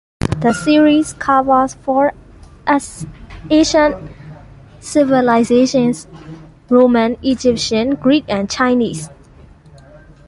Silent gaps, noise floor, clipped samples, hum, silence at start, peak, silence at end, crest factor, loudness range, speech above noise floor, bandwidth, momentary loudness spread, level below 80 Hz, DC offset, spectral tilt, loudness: none; -42 dBFS; under 0.1%; none; 0.25 s; -2 dBFS; 1.15 s; 14 dB; 3 LU; 29 dB; 11.5 kHz; 18 LU; -40 dBFS; under 0.1%; -5 dB/octave; -14 LUFS